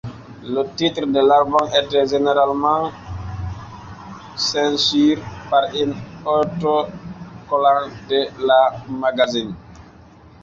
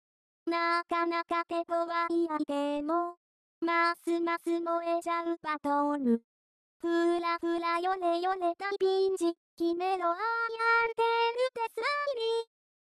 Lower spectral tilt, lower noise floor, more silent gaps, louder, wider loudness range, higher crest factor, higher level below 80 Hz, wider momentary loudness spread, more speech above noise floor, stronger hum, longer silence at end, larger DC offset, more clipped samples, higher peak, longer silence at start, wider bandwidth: first, -5 dB/octave vs -3.5 dB/octave; second, -45 dBFS vs under -90 dBFS; second, none vs 3.17-3.61 s, 6.24-6.80 s, 9.37-9.57 s; first, -18 LUFS vs -30 LUFS; about the same, 3 LU vs 2 LU; about the same, 16 dB vs 16 dB; first, -46 dBFS vs -76 dBFS; first, 20 LU vs 5 LU; second, 27 dB vs over 60 dB; neither; about the same, 0.6 s vs 0.55 s; neither; neither; first, -2 dBFS vs -16 dBFS; second, 0.05 s vs 0.45 s; second, 7.8 kHz vs 13 kHz